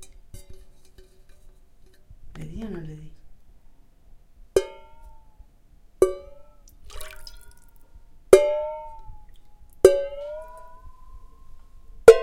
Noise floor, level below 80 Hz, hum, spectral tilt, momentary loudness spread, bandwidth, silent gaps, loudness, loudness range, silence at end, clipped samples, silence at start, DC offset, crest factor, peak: -52 dBFS; -46 dBFS; none; -5 dB/octave; 27 LU; 16.5 kHz; none; -21 LUFS; 20 LU; 0 s; under 0.1%; 0 s; under 0.1%; 26 dB; 0 dBFS